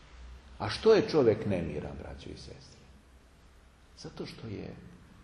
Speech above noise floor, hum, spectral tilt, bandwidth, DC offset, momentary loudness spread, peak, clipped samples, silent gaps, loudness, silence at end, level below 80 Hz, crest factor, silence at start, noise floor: 27 dB; none; -6.5 dB/octave; 10.5 kHz; under 0.1%; 26 LU; -12 dBFS; under 0.1%; none; -29 LUFS; 0.25 s; -54 dBFS; 20 dB; 0.15 s; -58 dBFS